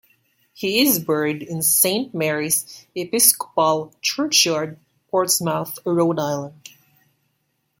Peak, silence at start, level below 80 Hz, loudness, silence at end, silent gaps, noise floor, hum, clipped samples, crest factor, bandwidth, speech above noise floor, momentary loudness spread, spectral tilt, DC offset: 0 dBFS; 0.6 s; -68 dBFS; -19 LUFS; 1.3 s; none; -71 dBFS; none; under 0.1%; 22 dB; 16.5 kHz; 50 dB; 11 LU; -2.5 dB/octave; under 0.1%